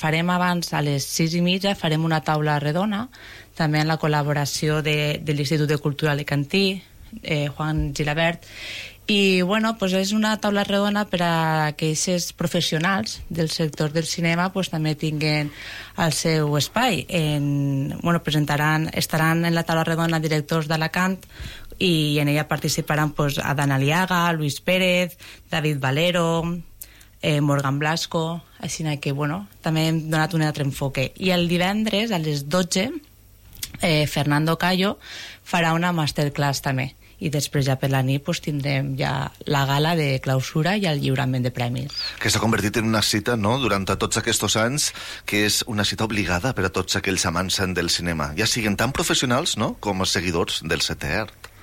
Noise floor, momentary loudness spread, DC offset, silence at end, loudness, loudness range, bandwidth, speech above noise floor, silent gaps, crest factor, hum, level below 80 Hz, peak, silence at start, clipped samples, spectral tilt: -47 dBFS; 7 LU; under 0.1%; 0.15 s; -22 LUFS; 2 LU; 16.5 kHz; 25 dB; none; 14 dB; none; -46 dBFS; -8 dBFS; 0 s; under 0.1%; -4.5 dB/octave